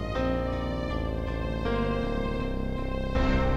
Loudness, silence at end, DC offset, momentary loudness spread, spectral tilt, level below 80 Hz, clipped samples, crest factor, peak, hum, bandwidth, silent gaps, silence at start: -30 LUFS; 0 s; 0.3%; 4 LU; -7.5 dB/octave; -32 dBFS; under 0.1%; 14 dB; -14 dBFS; none; 8.8 kHz; none; 0 s